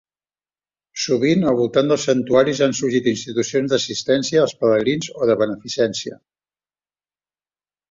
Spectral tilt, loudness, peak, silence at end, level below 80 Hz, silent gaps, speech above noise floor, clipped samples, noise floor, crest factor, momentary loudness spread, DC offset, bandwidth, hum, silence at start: -4.5 dB/octave; -19 LUFS; -2 dBFS; 1.75 s; -58 dBFS; none; over 72 dB; under 0.1%; under -90 dBFS; 18 dB; 6 LU; under 0.1%; 7.8 kHz; 50 Hz at -55 dBFS; 0.95 s